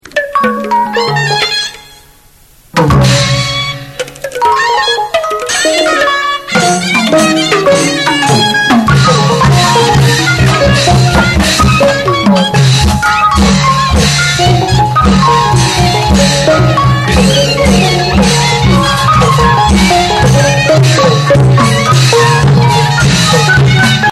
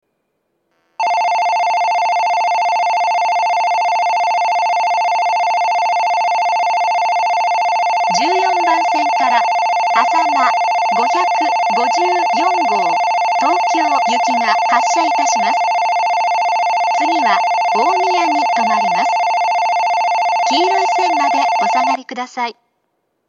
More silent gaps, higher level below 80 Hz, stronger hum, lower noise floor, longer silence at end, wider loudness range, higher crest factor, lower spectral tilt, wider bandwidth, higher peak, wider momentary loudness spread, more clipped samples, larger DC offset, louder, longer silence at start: neither; first, -22 dBFS vs -82 dBFS; neither; second, -41 dBFS vs -69 dBFS; second, 0 s vs 0.75 s; first, 4 LU vs 1 LU; second, 8 dB vs 14 dB; first, -4.5 dB/octave vs -1.5 dB/octave; first, 14 kHz vs 8.4 kHz; about the same, 0 dBFS vs 0 dBFS; first, 5 LU vs 1 LU; first, 0.4% vs under 0.1%; neither; first, -8 LUFS vs -14 LUFS; second, 0.15 s vs 1 s